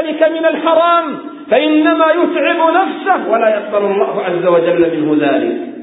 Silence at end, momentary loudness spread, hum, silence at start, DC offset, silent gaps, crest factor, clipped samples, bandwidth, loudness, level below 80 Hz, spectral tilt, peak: 0 s; 5 LU; none; 0 s; under 0.1%; none; 12 dB; under 0.1%; 4 kHz; -13 LUFS; -62 dBFS; -10.5 dB/octave; 0 dBFS